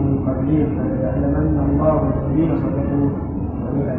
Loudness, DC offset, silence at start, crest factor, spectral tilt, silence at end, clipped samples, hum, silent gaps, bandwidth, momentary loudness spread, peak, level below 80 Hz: -19 LUFS; under 0.1%; 0 s; 16 dB; -13.5 dB/octave; 0 s; under 0.1%; none; none; 3.5 kHz; 6 LU; -4 dBFS; -30 dBFS